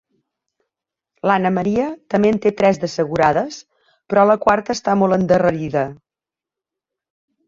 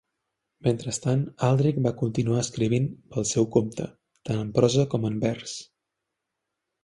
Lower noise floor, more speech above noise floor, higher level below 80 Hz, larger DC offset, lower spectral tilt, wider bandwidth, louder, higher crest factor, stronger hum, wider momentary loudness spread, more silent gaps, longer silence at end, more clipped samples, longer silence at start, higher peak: first, -89 dBFS vs -83 dBFS; first, 72 dB vs 58 dB; about the same, -52 dBFS vs -56 dBFS; neither; about the same, -6.5 dB/octave vs -6 dB/octave; second, 7.6 kHz vs 11.5 kHz; first, -17 LUFS vs -26 LUFS; about the same, 18 dB vs 20 dB; neither; second, 7 LU vs 12 LU; neither; first, 1.55 s vs 1.2 s; neither; first, 1.25 s vs 0.65 s; first, -2 dBFS vs -6 dBFS